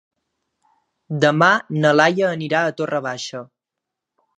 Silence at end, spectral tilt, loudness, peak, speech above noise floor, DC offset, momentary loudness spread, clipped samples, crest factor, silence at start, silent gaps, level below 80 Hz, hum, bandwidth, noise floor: 0.95 s; -5.5 dB/octave; -18 LUFS; 0 dBFS; 65 dB; under 0.1%; 15 LU; under 0.1%; 20 dB; 1.1 s; none; -72 dBFS; none; 10 kHz; -83 dBFS